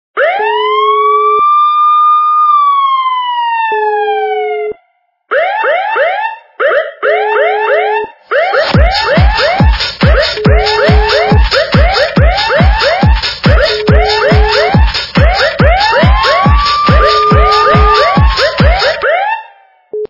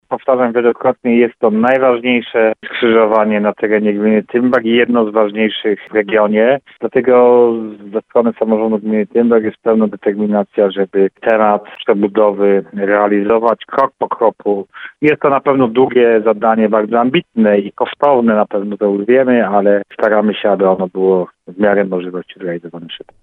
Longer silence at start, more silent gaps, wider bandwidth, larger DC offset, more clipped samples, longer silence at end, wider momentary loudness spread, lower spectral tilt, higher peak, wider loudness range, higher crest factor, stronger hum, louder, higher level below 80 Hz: about the same, 0.15 s vs 0.1 s; neither; first, 6 kHz vs 4.2 kHz; neither; first, 0.4% vs under 0.1%; second, 0.05 s vs 0.25 s; about the same, 6 LU vs 7 LU; second, -6 dB/octave vs -8.5 dB/octave; about the same, 0 dBFS vs 0 dBFS; first, 5 LU vs 2 LU; about the same, 8 dB vs 12 dB; neither; first, -9 LUFS vs -13 LUFS; first, -16 dBFS vs -60 dBFS